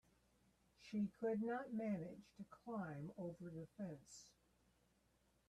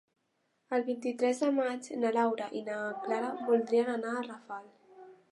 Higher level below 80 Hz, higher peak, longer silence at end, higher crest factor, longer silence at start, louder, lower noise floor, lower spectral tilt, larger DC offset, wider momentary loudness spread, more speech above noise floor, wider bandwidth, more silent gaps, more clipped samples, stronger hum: first, -80 dBFS vs -88 dBFS; second, -32 dBFS vs -16 dBFS; first, 1.2 s vs 0.15 s; about the same, 18 dB vs 18 dB; about the same, 0.8 s vs 0.7 s; second, -48 LUFS vs -32 LUFS; about the same, -79 dBFS vs -77 dBFS; first, -7 dB/octave vs -4.5 dB/octave; neither; first, 17 LU vs 9 LU; second, 32 dB vs 46 dB; about the same, 11.5 kHz vs 11.5 kHz; neither; neither; neither